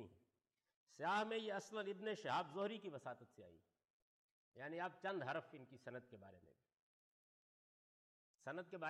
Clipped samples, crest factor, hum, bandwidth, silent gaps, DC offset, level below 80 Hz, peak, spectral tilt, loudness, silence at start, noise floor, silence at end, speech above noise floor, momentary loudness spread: under 0.1%; 16 dB; none; 12 kHz; 0.76-0.87 s, 3.90-4.52 s, 6.79-8.39 s; under 0.1%; under -90 dBFS; -34 dBFS; -5 dB/octave; -47 LUFS; 0 s; under -90 dBFS; 0 s; over 42 dB; 20 LU